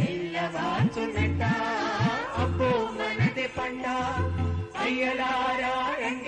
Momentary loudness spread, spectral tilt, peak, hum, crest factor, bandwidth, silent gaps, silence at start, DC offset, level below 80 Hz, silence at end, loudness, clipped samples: 4 LU; -6 dB/octave; -12 dBFS; none; 14 dB; 9.6 kHz; none; 0 s; under 0.1%; -52 dBFS; 0 s; -27 LUFS; under 0.1%